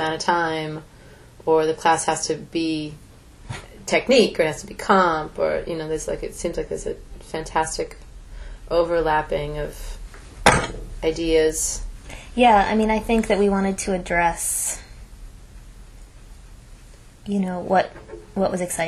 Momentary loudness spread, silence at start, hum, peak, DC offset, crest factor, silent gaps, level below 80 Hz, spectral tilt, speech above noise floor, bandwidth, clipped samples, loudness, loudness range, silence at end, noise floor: 18 LU; 0 s; none; 0 dBFS; under 0.1%; 22 dB; none; -38 dBFS; -4 dB/octave; 24 dB; 14 kHz; under 0.1%; -22 LUFS; 7 LU; 0 s; -45 dBFS